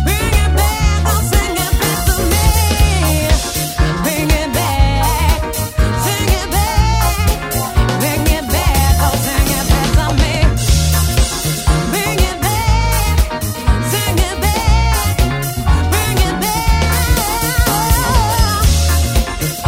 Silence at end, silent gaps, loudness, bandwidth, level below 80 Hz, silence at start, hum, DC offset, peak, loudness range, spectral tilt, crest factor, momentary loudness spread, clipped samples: 0 s; none; -14 LUFS; 16.5 kHz; -16 dBFS; 0 s; none; under 0.1%; 0 dBFS; 1 LU; -4 dB/octave; 14 dB; 3 LU; under 0.1%